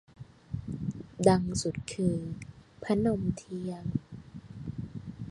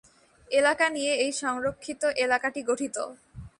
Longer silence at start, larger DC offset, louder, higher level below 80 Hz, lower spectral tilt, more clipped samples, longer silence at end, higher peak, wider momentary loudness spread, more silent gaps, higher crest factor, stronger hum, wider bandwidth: second, 0.2 s vs 0.5 s; neither; second, -32 LUFS vs -26 LUFS; first, -52 dBFS vs -58 dBFS; first, -6.5 dB/octave vs -2.5 dB/octave; neither; about the same, 0 s vs 0.1 s; about the same, -8 dBFS vs -10 dBFS; first, 21 LU vs 9 LU; neither; first, 24 dB vs 18 dB; neither; about the same, 11.5 kHz vs 11.5 kHz